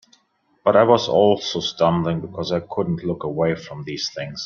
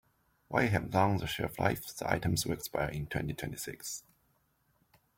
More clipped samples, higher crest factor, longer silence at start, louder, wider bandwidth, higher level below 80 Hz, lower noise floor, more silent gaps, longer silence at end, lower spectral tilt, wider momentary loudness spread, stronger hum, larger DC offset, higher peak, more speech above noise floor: neither; about the same, 20 dB vs 22 dB; first, 0.65 s vs 0.5 s; first, -20 LUFS vs -33 LUFS; second, 7.2 kHz vs 17 kHz; about the same, -56 dBFS vs -56 dBFS; second, -64 dBFS vs -73 dBFS; neither; second, 0 s vs 1.2 s; about the same, -5.5 dB/octave vs -5 dB/octave; about the same, 11 LU vs 10 LU; neither; neither; first, -2 dBFS vs -12 dBFS; about the same, 44 dB vs 41 dB